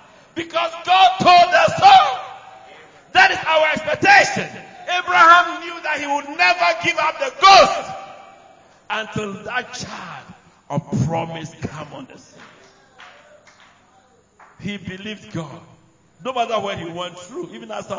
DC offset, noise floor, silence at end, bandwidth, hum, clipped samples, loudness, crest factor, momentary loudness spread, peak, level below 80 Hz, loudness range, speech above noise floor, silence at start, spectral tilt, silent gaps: under 0.1%; -55 dBFS; 0 s; 7.6 kHz; none; under 0.1%; -15 LUFS; 18 dB; 22 LU; 0 dBFS; -54 dBFS; 20 LU; 36 dB; 0.35 s; -3.5 dB/octave; none